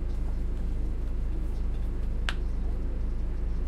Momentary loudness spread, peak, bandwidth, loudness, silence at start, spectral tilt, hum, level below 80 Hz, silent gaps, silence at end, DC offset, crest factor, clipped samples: 2 LU; -8 dBFS; 8.6 kHz; -34 LUFS; 0 s; -6.5 dB/octave; none; -28 dBFS; none; 0 s; under 0.1%; 20 dB; under 0.1%